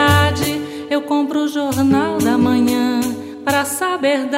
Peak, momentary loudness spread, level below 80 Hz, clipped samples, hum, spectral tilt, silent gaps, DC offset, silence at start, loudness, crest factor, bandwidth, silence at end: 0 dBFS; 7 LU; -44 dBFS; under 0.1%; none; -5 dB/octave; none; under 0.1%; 0 s; -17 LUFS; 16 dB; 16.5 kHz; 0 s